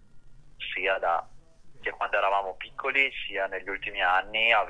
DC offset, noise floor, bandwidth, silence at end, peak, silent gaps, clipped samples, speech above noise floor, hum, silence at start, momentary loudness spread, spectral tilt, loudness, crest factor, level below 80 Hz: under 0.1%; -47 dBFS; 9.8 kHz; 0 s; -8 dBFS; none; under 0.1%; 20 dB; none; 0 s; 11 LU; -3 dB/octave; -27 LUFS; 22 dB; -54 dBFS